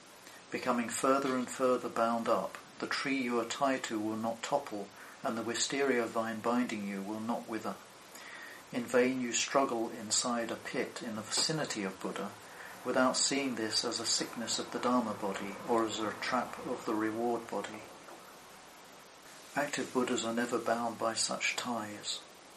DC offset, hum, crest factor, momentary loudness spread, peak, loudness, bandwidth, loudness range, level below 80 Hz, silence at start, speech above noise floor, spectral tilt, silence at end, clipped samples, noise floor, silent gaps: under 0.1%; none; 20 dB; 17 LU; -16 dBFS; -34 LUFS; 13 kHz; 5 LU; -76 dBFS; 0 s; 20 dB; -2.5 dB/octave; 0 s; under 0.1%; -54 dBFS; none